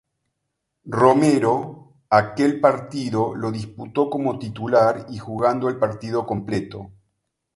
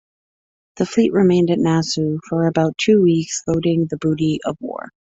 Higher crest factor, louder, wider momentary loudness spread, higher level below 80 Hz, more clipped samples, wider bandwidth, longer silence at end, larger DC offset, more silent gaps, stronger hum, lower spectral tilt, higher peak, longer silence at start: first, 20 dB vs 14 dB; second, -21 LUFS vs -18 LUFS; about the same, 12 LU vs 10 LU; about the same, -56 dBFS vs -52 dBFS; neither; first, 11.5 kHz vs 8 kHz; first, 0.65 s vs 0.3 s; neither; neither; neither; about the same, -7 dB/octave vs -6 dB/octave; first, 0 dBFS vs -4 dBFS; about the same, 0.85 s vs 0.75 s